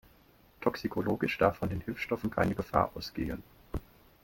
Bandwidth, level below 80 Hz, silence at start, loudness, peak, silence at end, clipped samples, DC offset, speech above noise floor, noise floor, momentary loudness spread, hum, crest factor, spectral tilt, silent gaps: 17 kHz; -50 dBFS; 0.6 s; -32 LUFS; -10 dBFS; 0.45 s; under 0.1%; under 0.1%; 30 dB; -62 dBFS; 14 LU; none; 24 dB; -7 dB/octave; none